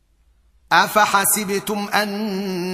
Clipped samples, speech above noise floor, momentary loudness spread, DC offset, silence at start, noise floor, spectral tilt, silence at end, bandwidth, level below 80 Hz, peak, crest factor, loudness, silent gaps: under 0.1%; 39 dB; 9 LU; under 0.1%; 0.7 s; -58 dBFS; -2.5 dB/octave; 0 s; 15.5 kHz; -58 dBFS; -2 dBFS; 18 dB; -18 LUFS; none